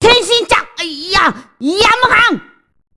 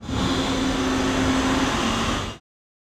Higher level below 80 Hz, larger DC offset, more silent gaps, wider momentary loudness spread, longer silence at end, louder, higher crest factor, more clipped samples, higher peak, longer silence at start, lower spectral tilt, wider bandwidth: about the same, -38 dBFS vs -36 dBFS; neither; neither; first, 13 LU vs 6 LU; about the same, 0.55 s vs 0.6 s; first, -11 LUFS vs -22 LUFS; about the same, 12 dB vs 14 dB; first, 0.1% vs under 0.1%; first, 0 dBFS vs -10 dBFS; about the same, 0 s vs 0 s; second, -2.5 dB/octave vs -4.5 dB/octave; second, 12 kHz vs 14.5 kHz